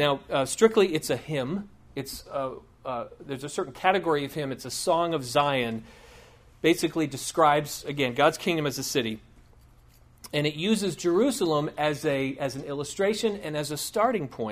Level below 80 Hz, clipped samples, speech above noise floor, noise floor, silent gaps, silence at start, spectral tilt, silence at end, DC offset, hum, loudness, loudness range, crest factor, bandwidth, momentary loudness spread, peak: -58 dBFS; under 0.1%; 29 dB; -55 dBFS; none; 0 s; -4.5 dB/octave; 0 s; under 0.1%; none; -27 LUFS; 4 LU; 22 dB; 15.5 kHz; 12 LU; -6 dBFS